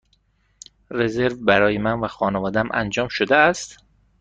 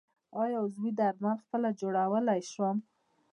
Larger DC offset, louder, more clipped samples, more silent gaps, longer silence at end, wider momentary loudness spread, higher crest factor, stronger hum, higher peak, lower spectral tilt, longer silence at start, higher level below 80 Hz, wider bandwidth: neither; first, -20 LUFS vs -32 LUFS; neither; neither; about the same, 0.45 s vs 0.5 s; first, 8 LU vs 5 LU; about the same, 20 dB vs 16 dB; neither; first, -2 dBFS vs -16 dBFS; second, -5 dB/octave vs -6.5 dB/octave; first, 0.9 s vs 0.35 s; first, -50 dBFS vs -90 dBFS; second, 9.4 kHz vs 10.5 kHz